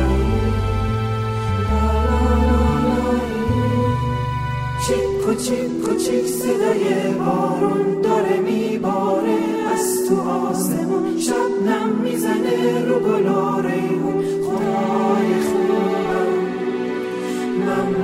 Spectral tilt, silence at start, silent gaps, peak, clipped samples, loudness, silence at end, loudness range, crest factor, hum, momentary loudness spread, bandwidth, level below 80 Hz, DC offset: -6 dB/octave; 0 s; none; -6 dBFS; under 0.1%; -19 LUFS; 0 s; 1 LU; 12 dB; none; 4 LU; 16 kHz; -30 dBFS; under 0.1%